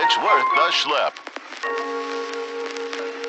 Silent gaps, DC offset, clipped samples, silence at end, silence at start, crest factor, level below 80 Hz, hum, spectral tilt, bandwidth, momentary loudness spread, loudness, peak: none; under 0.1%; under 0.1%; 0 s; 0 s; 18 dB; -80 dBFS; none; -0.5 dB/octave; 9.2 kHz; 12 LU; -21 LUFS; -6 dBFS